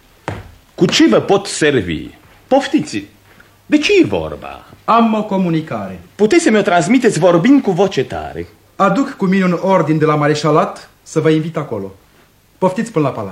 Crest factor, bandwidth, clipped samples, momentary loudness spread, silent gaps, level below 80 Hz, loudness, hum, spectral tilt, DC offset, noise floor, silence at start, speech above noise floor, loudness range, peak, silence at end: 14 dB; 14.5 kHz; under 0.1%; 17 LU; none; -48 dBFS; -14 LUFS; none; -5.5 dB/octave; under 0.1%; -50 dBFS; 0.25 s; 36 dB; 3 LU; 0 dBFS; 0 s